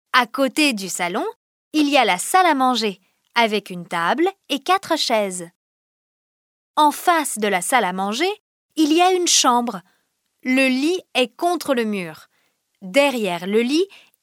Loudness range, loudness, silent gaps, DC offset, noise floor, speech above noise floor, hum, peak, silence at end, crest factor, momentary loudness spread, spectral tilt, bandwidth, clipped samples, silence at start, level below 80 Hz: 3 LU; -19 LUFS; 1.36-1.71 s, 5.55-6.74 s, 8.40-8.69 s; under 0.1%; -69 dBFS; 50 dB; none; 0 dBFS; 0.35 s; 20 dB; 11 LU; -2.5 dB/octave; 17.5 kHz; under 0.1%; 0.15 s; -78 dBFS